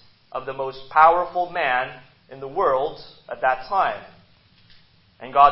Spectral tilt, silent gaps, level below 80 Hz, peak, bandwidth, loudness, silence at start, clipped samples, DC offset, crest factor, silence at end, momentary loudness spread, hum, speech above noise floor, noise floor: -8.5 dB/octave; none; -56 dBFS; -2 dBFS; 5.8 kHz; -21 LUFS; 0.35 s; under 0.1%; under 0.1%; 20 dB; 0 s; 20 LU; none; 34 dB; -55 dBFS